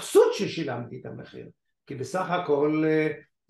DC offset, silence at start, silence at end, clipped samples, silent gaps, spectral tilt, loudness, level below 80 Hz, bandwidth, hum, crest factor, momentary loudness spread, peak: under 0.1%; 0 s; 0.3 s; under 0.1%; none; -5.5 dB/octave; -25 LUFS; -72 dBFS; 12.5 kHz; none; 18 dB; 20 LU; -8 dBFS